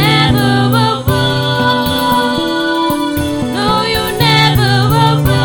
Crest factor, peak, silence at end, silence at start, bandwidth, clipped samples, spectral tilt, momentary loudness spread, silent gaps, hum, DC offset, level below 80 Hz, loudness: 12 dB; 0 dBFS; 0 s; 0 s; 17.5 kHz; under 0.1%; -5.5 dB/octave; 5 LU; none; none; under 0.1%; -32 dBFS; -12 LUFS